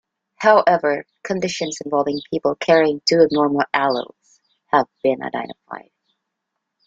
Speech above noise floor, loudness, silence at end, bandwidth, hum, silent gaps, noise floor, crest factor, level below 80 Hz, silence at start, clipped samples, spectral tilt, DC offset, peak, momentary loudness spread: 60 dB; -19 LUFS; 1.05 s; 8 kHz; none; none; -79 dBFS; 18 dB; -64 dBFS; 0.4 s; under 0.1%; -4.5 dB/octave; under 0.1%; -2 dBFS; 14 LU